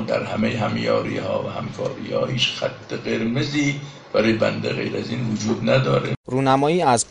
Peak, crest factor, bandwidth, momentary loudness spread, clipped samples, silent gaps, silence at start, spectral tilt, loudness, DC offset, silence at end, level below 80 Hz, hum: -4 dBFS; 16 dB; 11 kHz; 9 LU; under 0.1%; 6.17-6.24 s; 0 s; -5 dB/octave; -22 LUFS; under 0.1%; 0 s; -52 dBFS; none